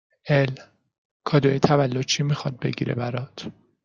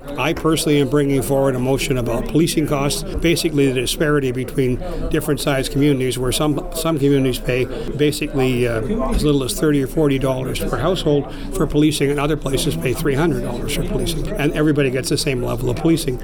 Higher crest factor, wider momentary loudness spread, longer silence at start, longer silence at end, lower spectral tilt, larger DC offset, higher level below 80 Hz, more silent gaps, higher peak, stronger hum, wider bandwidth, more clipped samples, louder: first, 22 dB vs 12 dB; first, 16 LU vs 5 LU; first, 0.25 s vs 0 s; first, 0.35 s vs 0 s; about the same, -5.5 dB/octave vs -5.5 dB/octave; second, under 0.1% vs 0.7%; second, -60 dBFS vs -30 dBFS; first, 0.98-1.20 s vs none; first, -2 dBFS vs -6 dBFS; neither; second, 7.2 kHz vs 19.5 kHz; neither; second, -23 LUFS vs -19 LUFS